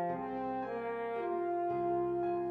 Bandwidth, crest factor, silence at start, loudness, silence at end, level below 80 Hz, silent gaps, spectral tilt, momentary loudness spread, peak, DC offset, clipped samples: 4.5 kHz; 10 dB; 0 s; -36 LUFS; 0 s; -68 dBFS; none; -9 dB/octave; 4 LU; -24 dBFS; under 0.1%; under 0.1%